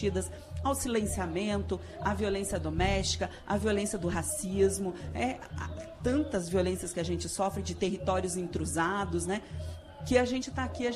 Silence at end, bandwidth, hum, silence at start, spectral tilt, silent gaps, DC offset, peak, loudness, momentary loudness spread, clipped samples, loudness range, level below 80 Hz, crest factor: 0 s; 14 kHz; none; 0 s; -4.5 dB/octave; none; under 0.1%; -12 dBFS; -32 LUFS; 8 LU; under 0.1%; 2 LU; -44 dBFS; 18 dB